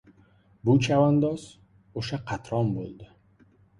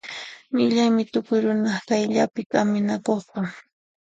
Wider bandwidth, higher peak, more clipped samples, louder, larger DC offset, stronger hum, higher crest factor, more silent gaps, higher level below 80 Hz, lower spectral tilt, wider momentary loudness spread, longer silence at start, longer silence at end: first, 11 kHz vs 8 kHz; second, -10 dBFS vs -6 dBFS; neither; second, -26 LUFS vs -23 LUFS; neither; neither; about the same, 18 dB vs 16 dB; second, none vs 2.46-2.50 s; first, -56 dBFS vs -68 dBFS; first, -7 dB/octave vs -5.5 dB/octave; first, 16 LU vs 11 LU; first, 0.65 s vs 0.05 s; first, 0.75 s vs 0.5 s